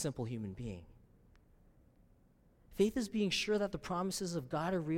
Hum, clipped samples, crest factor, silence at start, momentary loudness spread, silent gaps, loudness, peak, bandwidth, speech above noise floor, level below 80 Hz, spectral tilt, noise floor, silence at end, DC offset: none; under 0.1%; 18 dB; 0 s; 13 LU; none; -37 LUFS; -20 dBFS; 16.5 kHz; 31 dB; -60 dBFS; -5 dB/octave; -67 dBFS; 0 s; under 0.1%